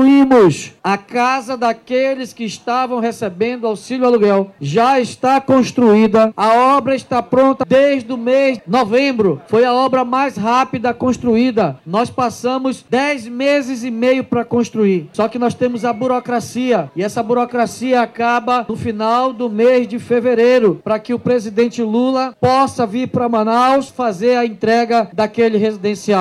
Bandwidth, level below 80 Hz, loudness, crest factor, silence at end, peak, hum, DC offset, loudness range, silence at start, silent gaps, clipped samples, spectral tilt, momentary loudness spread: 12.5 kHz; -54 dBFS; -15 LUFS; 12 dB; 0 s; -2 dBFS; none; under 0.1%; 4 LU; 0 s; none; under 0.1%; -6 dB/octave; 7 LU